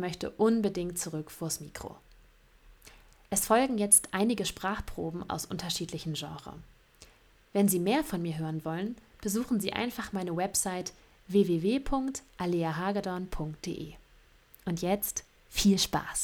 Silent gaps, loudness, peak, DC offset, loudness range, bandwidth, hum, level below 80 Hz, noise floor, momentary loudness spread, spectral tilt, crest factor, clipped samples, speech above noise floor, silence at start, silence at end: none; -30 LUFS; -8 dBFS; under 0.1%; 6 LU; 19.5 kHz; none; -52 dBFS; -60 dBFS; 13 LU; -4 dB/octave; 24 dB; under 0.1%; 30 dB; 0 s; 0 s